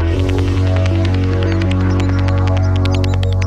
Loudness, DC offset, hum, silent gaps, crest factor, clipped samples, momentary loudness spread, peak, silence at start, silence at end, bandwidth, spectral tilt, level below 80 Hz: -15 LUFS; under 0.1%; none; none; 10 dB; under 0.1%; 1 LU; -4 dBFS; 0 s; 0 s; 7.8 kHz; -7.5 dB/octave; -24 dBFS